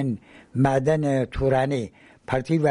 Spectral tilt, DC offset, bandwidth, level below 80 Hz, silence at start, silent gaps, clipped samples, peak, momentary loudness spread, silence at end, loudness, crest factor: -7.5 dB/octave; under 0.1%; 11.5 kHz; -44 dBFS; 0 s; none; under 0.1%; -8 dBFS; 11 LU; 0 s; -23 LUFS; 14 dB